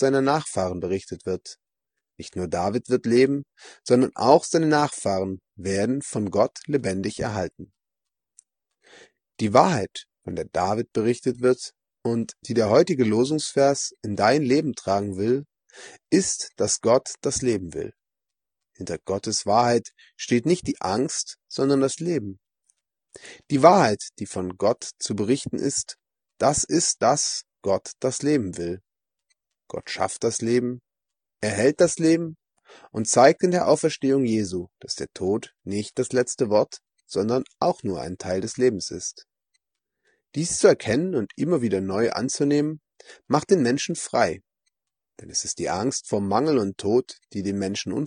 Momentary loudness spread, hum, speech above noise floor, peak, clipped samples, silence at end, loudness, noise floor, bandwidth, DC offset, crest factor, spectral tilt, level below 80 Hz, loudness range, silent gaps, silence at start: 13 LU; none; 66 dB; 0 dBFS; under 0.1%; 0 s; -23 LUFS; -89 dBFS; 10 kHz; under 0.1%; 24 dB; -4.5 dB/octave; -60 dBFS; 5 LU; none; 0 s